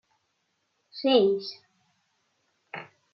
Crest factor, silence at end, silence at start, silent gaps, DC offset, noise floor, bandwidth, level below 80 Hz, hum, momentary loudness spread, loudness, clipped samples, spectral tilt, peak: 22 dB; 0.3 s; 0.95 s; none; under 0.1%; -76 dBFS; 6 kHz; -80 dBFS; none; 21 LU; -24 LUFS; under 0.1%; -6.5 dB/octave; -8 dBFS